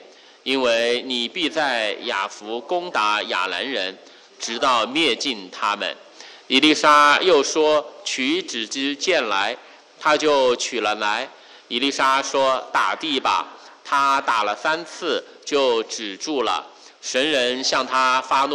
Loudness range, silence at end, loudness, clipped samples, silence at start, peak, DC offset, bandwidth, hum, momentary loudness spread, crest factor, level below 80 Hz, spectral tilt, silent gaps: 5 LU; 0 s; -20 LUFS; under 0.1%; 0 s; -4 dBFS; under 0.1%; 12 kHz; none; 10 LU; 18 dB; -66 dBFS; -1.5 dB/octave; none